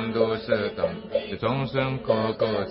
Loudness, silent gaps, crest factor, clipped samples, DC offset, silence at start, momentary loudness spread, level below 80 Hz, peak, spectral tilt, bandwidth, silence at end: -26 LUFS; none; 18 dB; under 0.1%; under 0.1%; 0 s; 5 LU; -52 dBFS; -8 dBFS; -11 dB/octave; 5.8 kHz; 0 s